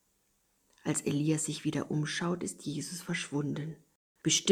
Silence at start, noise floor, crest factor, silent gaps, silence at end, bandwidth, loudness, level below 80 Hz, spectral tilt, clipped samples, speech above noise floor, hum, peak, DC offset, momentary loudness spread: 0.85 s; -74 dBFS; 22 dB; 3.95-4.15 s; 0 s; 15 kHz; -33 LUFS; -70 dBFS; -4 dB/octave; under 0.1%; 41 dB; none; -10 dBFS; under 0.1%; 9 LU